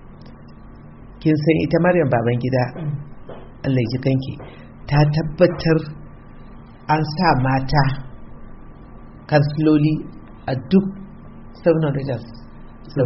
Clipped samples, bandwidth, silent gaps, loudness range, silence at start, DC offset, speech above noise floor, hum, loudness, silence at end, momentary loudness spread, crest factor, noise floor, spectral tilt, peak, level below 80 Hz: under 0.1%; 6 kHz; none; 2 LU; 0.05 s; under 0.1%; 22 dB; none; -19 LUFS; 0 s; 21 LU; 18 dB; -40 dBFS; -6.5 dB/octave; -2 dBFS; -40 dBFS